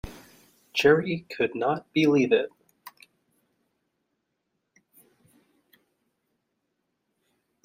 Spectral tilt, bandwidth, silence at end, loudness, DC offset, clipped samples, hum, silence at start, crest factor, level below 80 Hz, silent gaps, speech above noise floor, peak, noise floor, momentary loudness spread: -6 dB/octave; 16 kHz; 4.75 s; -24 LUFS; under 0.1%; under 0.1%; none; 0.05 s; 24 dB; -58 dBFS; none; 56 dB; -6 dBFS; -79 dBFS; 11 LU